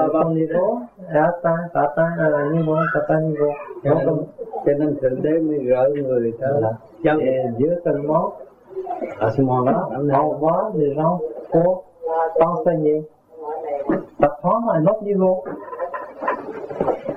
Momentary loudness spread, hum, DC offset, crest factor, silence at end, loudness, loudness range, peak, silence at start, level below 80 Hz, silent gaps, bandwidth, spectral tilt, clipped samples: 10 LU; none; under 0.1%; 18 dB; 0 s; -20 LUFS; 2 LU; -2 dBFS; 0 s; -54 dBFS; none; 5.2 kHz; -10.5 dB/octave; under 0.1%